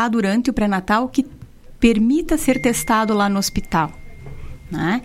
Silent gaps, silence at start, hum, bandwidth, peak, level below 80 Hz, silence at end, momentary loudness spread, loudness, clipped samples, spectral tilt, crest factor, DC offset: none; 0 s; none; 16 kHz; -2 dBFS; -36 dBFS; 0 s; 14 LU; -19 LUFS; under 0.1%; -5 dB/octave; 16 dB; under 0.1%